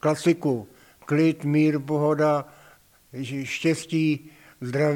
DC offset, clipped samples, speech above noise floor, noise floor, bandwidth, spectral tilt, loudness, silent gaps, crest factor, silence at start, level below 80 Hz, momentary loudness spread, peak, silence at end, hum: under 0.1%; under 0.1%; 32 dB; -55 dBFS; 16 kHz; -6.5 dB/octave; -24 LUFS; none; 16 dB; 0.05 s; -68 dBFS; 14 LU; -8 dBFS; 0 s; none